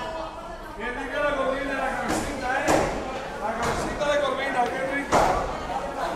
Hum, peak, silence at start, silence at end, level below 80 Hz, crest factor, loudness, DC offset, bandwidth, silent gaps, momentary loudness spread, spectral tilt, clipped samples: none; -6 dBFS; 0 s; 0 s; -42 dBFS; 20 dB; -26 LUFS; under 0.1%; 15.5 kHz; none; 10 LU; -4 dB/octave; under 0.1%